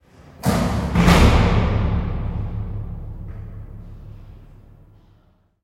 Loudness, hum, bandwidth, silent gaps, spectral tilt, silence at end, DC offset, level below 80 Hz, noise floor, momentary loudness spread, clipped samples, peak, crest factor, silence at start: -19 LUFS; none; 16.5 kHz; none; -6.5 dB/octave; 1.2 s; under 0.1%; -26 dBFS; -57 dBFS; 25 LU; under 0.1%; -2 dBFS; 20 dB; 0.4 s